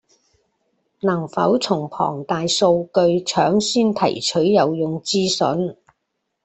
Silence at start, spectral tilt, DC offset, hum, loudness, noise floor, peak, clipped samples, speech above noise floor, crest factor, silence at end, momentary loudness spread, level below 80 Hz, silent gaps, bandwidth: 1.05 s; -4.5 dB/octave; under 0.1%; none; -19 LUFS; -75 dBFS; -4 dBFS; under 0.1%; 57 dB; 16 dB; 0.7 s; 7 LU; -60 dBFS; none; 8.6 kHz